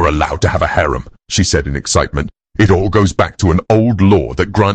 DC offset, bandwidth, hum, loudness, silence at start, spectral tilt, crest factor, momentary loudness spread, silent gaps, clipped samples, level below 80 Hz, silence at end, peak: under 0.1%; 9 kHz; none; -14 LUFS; 0 s; -5.5 dB/octave; 12 dB; 8 LU; none; under 0.1%; -26 dBFS; 0 s; 0 dBFS